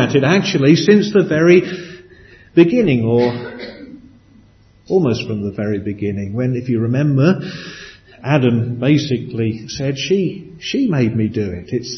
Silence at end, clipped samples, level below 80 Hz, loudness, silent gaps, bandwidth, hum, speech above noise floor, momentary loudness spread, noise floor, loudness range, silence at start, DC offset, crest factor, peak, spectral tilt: 0 s; under 0.1%; -50 dBFS; -16 LUFS; none; 6.4 kHz; none; 33 dB; 16 LU; -48 dBFS; 7 LU; 0 s; under 0.1%; 16 dB; 0 dBFS; -7 dB/octave